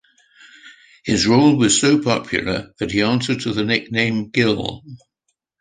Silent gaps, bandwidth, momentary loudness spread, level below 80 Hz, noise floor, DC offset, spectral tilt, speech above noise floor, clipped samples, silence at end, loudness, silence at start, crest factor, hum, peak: none; 9.8 kHz; 11 LU; -48 dBFS; -73 dBFS; under 0.1%; -4 dB/octave; 56 dB; under 0.1%; 0.65 s; -18 LUFS; 0.65 s; 18 dB; none; -2 dBFS